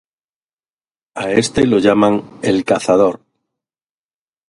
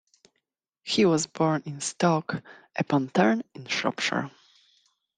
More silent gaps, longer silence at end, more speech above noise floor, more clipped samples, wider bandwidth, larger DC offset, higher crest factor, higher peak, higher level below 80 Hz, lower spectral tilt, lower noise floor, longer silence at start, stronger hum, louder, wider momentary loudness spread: neither; first, 1.35 s vs 0.9 s; first, over 76 dB vs 54 dB; neither; first, 11.5 kHz vs 10 kHz; neither; about the same, 18 dB vs 20 dB; first, 0 dBFS vs -8 dBFS; first, -48 dBFS vs -70 dBFS; about the same, -5.5 dB/octave vs -4.5 dB/octave; first, under -90 dBFS vs -80 dBFS; first, 1.15 s vs 0.85 s; neither; first, -15 LUFS vs -26 LUFS; about the same, 11 LU vs 13 LU